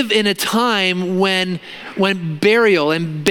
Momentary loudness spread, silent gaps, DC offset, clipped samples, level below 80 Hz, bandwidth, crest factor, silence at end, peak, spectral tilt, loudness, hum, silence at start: 7 LU; none; under 0.1%; under 0.1%; -62 dBFS; 17 kHz; 16 dB; 0 s; 0 dBFS; -4.5 dB/octave; -16 LUFS; none; 0 s